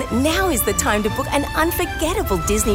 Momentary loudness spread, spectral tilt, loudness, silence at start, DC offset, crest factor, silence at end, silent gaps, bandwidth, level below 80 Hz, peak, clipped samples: 3 LU; -4 dB/octave; -19 LUFS; 0 s; under 0.1%; 16 dB; 0 s; none; 16 kHz; -30 dBFS; -4 dBFS; under 0.1%